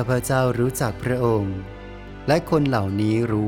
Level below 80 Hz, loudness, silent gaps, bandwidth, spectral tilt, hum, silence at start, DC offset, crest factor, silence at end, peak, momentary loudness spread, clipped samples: -42 dBFS; -22 LUFS; none; 17.5 kHz; -6.5 dB/octave; none; 0 s; under 0.1%; 16 dB; 0 s; -6 dBFS; 13 LU; under 0.1%